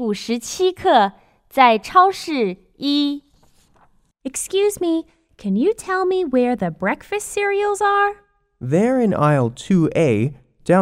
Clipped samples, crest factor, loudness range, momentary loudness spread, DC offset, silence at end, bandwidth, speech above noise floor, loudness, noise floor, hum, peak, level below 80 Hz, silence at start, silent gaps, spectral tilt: under 0.1%; 18 dB; 5 LU; 11 LU; under 0.1%; 0 s; 16 kHz; 38 dB; -19 LUFS; -56 dBFS; none; 0 dBFS; -54 dBFS; 0 s; none; -5.5 dB/octave